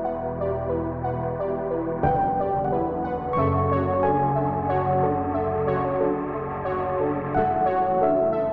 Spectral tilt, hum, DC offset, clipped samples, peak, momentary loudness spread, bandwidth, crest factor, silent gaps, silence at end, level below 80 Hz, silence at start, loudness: -11.5 dB/octave; none; 0.2%; under 0.1%; -10 dBFS; 6 LU; 4.7 kHz; 14 dB; none; 0 s; -44 dBFS; 0 s; -24 LUFS